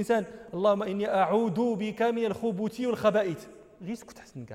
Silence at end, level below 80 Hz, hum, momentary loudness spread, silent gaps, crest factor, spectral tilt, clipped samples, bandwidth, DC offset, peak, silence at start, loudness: 0 s; -66 dBFS; none; 15 LU; none; 18 dB; -6.5 dB/octave; under 0.1%; 15 kHz; under 0.1%; -12 dBFS; 0 s; -28 LUFS